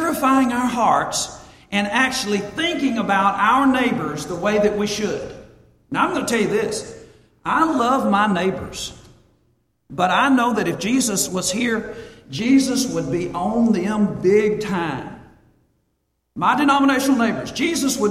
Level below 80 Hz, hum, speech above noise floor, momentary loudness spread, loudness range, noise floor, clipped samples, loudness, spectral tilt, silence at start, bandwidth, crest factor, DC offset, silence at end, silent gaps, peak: -50 dBFS; none; 52 dB; 12 LU; 3 LU; -70 dBFS; under 0.1%; -19 LUFS; -4 dB/octave; 0 s; 15.5 kHz; 16 dB; under 0.1%; 0 s; none; -4 dBFS